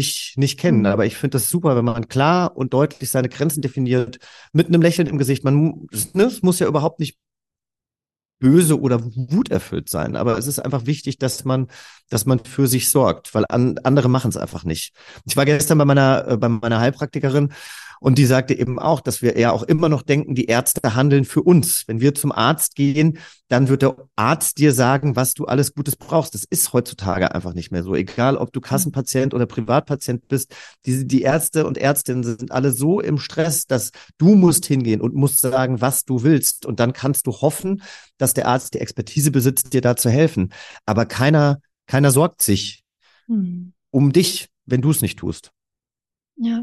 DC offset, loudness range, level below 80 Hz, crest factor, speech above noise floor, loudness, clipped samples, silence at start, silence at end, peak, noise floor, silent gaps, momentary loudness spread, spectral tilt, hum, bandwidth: under 0.1%; 4 LU; -52 dBFS; 16 dB; over 72 dB; -18 LUFS; under 0.1%; 0 s; 0 s; -2 dBFS; under -90 dBFS; none; 9 LU; -5.5 dB/octave; none; 13 kHz